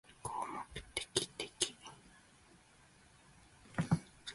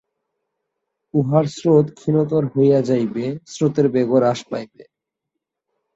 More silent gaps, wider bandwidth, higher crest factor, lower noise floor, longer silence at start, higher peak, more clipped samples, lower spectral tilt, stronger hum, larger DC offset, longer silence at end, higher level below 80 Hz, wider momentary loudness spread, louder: neither; first, 11.5 kHz vs 8 kHz; first, 32 dB vs 18 dB; second, -65 dBFS vs -81 dBFS; second, 0.1 s vs 1.15 s; second, -12 dBFS vs -2 dBFS; neither; second, -3.5 dB/octave vs -8 dB/octave; neither; neither; second, 0 s vs 1.15 s; about the same, -64 dBFS vs -62 dBFS; first, 18 LU vs 10 LU; second, -40 LUFS vs -18 LUFS